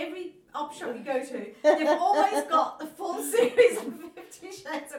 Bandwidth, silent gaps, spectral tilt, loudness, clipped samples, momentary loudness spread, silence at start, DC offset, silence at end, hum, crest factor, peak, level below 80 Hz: 18 kHz; none; -2.5 dB/octave; -26 LUFS; under 0.1%; 18 LU; 0 s; under 0.1%; 0 s; none; 18 dB; -8 dBFS; -76 dBFS